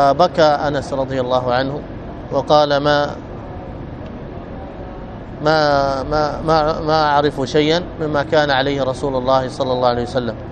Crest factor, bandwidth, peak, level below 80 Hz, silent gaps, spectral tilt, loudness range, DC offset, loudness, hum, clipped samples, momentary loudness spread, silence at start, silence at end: 18 dB; 9.6 kHz; 0 dBFS; -36 dBFS; none; -6 dB/octave; 4 LU; under 0.1%; -17 LUFS; none; under 0.1%; 17 LU; 0 s; 0 s